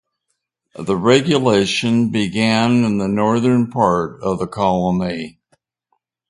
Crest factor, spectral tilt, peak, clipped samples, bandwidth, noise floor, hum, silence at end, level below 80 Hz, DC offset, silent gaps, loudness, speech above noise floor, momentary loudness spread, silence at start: 18 dB; -6 dB/octave; 0 dBFS; under 0.1%; 11.5 kHz; -74 dBFS; none; 1 s; -48 dBFS; under 0.1%; none; -17 LUFS; 58 dB; 8 LU; 0.8 s